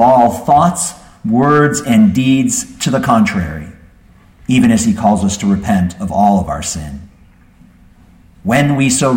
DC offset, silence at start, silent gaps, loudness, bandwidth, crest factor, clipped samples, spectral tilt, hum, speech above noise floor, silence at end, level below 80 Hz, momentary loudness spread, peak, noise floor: under 0.1%; 0 s; none; -13 LUFS; 16.5 kHz; 14 dB; under 0.1%; -5 dB/octave; none; 33 dB; 0 s; -38 dBFS; 13 LU; 0 dBFS; -45 dBFS